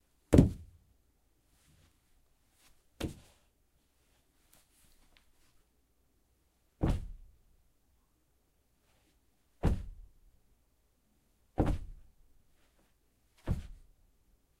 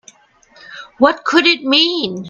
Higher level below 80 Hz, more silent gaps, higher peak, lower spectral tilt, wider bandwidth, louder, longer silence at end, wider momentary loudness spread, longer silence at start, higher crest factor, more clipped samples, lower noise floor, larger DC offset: first, -44 dBFS vs -58 dBFS; neither; second, -6 dBFS vs 0 dBFS; first, -8 dB/octave vs -3.5 dB/octave; first, 16 kHz vs 7.6 kHz; second, -33 LUFS vs -13 LUFS; first, 0.85 s vs 0 s; first, 26 LU vs 17 LU; second, 0.3 s vs 0.7 s; first, 32 dB vs 16 dB; neither; first, -74 dBFS vs -50 dBFS; neither